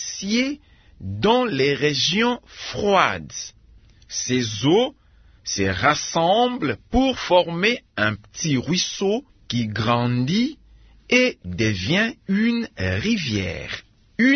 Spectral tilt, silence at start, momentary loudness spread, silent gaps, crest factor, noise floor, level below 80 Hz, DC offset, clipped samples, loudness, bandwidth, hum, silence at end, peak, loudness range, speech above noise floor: -4.5 dB/octave; 0 s; 11 LU; none; 20 dB; -51 dBFS; -46 dBFS; under 0.1%; under 0.1%; -21 LUFS; 6.6 kHz; none; 0 s; -2 dBFS; 2 LU; 29 dB